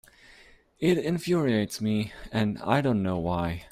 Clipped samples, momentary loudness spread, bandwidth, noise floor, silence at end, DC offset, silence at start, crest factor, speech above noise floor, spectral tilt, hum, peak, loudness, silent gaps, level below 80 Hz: under 0.1%; 5 LU; 15 kHz; -56 dBFS; 0.05 s; under 0.1%; 0.8 s; 20 dB; 29 dB; -6.5 dB/octave; none; -6 dBFS; -27 LUFS; none; -52 dBFS